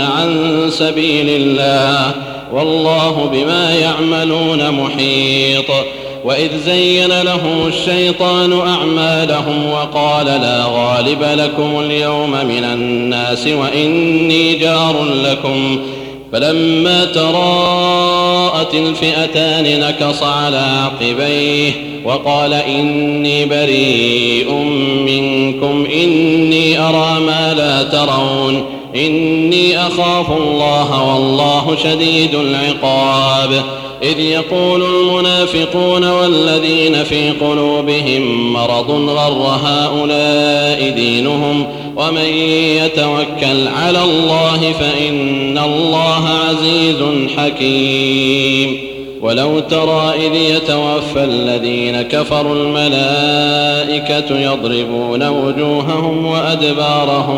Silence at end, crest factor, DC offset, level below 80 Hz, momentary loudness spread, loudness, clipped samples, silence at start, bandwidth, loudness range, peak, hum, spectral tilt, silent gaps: 0 s; 12 dB; under 0.1%; -46 dBFS; 4 LU; -12 LUFS; under 0.1%; 0 s; 16 kHz; 2 LU; 0 dBFS; none; -5 dB/octave; none